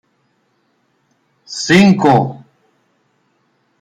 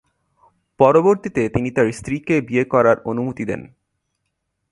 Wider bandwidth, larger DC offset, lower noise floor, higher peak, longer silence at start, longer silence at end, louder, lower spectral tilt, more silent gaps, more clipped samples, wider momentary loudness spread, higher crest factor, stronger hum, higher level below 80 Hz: about the same, 11 kHz vs 11.5 kHz; neither; second, -62 dBFS vs -74 dBFS; about the same, 0 dBFS vs 0 dBFS; first, 1.5 s vs 0.8 s; first, 1.45 s vs 1.05 s; first, -12 LUFS vs -18 LUFS; second, -5.5 dB/octave vs -7.5 dB/octave; neither; neither; first, 15 LU vs 12 LU; about the same, 16 dB vs 20 dB; neither; about the same, -54 dBFS vs -50 dBFS